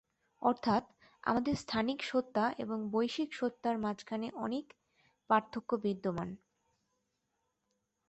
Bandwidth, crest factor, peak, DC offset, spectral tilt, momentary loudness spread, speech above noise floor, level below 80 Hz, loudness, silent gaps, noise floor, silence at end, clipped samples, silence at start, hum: 8.2 kHz; 22 dB; -16 dBFS; under 0.1%; -6 dB/octave; 7 LU; 49 dB; -68 dBFS; -35 LUFS; none; -83 dBFS; 1.75 s; under 0.1%; 0.4 s; none